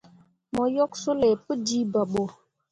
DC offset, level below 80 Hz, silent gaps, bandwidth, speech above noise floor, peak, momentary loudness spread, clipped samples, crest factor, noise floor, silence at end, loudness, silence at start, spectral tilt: under 0.1%; -60 dBFS; none; 11 kHz; 32 dB; -10 dBFS; 7 LU; under 0.1%; 16 dB; -57 dBFS; 0.4 s; -26 LUFS; 0.55 s; -5 dB/octave